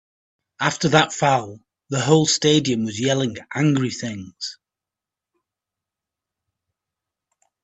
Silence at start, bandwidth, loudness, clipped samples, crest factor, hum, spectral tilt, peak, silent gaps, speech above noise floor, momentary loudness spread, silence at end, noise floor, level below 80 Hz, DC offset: 0.6 s; 8.6 kHz; -20 LUFS; under 0.1%; 22 dB; none; -4.5 dB/octave; 0 dBFS; none; 68 dB; 15 LU; 3.1 s; -88 dBFS; -62 dBFS; under 0.1%